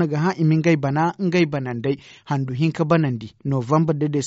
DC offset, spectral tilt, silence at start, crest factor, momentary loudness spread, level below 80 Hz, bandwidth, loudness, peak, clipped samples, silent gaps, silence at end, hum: under 0.1%; -7 dB/octave; 0 s; 16 dB; 7 LU; -58 dBFS; 7.6 kHz; -21 LUFS; -4 dBFS; under 0.1%; none; 0 s; none